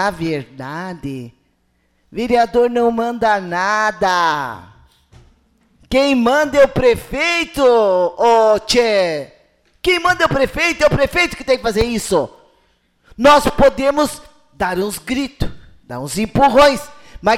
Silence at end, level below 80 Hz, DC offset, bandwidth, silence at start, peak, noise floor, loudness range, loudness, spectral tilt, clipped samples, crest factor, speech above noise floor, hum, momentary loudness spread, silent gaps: 0 s; -36 dBFS; under 0.1%; 16 kHz; 0 s; -2 dBFS; -62 dBFS; 4 LU; -15 LUFS; -4.5 dB/octave; under 0.1%; 14 dB; 47 dB; none; 15 LU; none